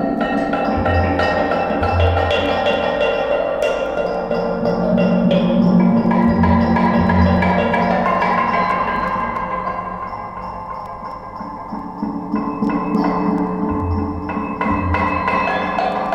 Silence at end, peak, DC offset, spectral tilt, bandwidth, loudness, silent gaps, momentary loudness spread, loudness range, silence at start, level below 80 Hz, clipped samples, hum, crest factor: 0 s; -2 dBFS; under 0.1%; -8 dB/octave; 8.6 kHz; -17 LUFS; none; 13 LU; 9 LU; 0 s; -34 dBFS; under 0.1%; none; 16 dB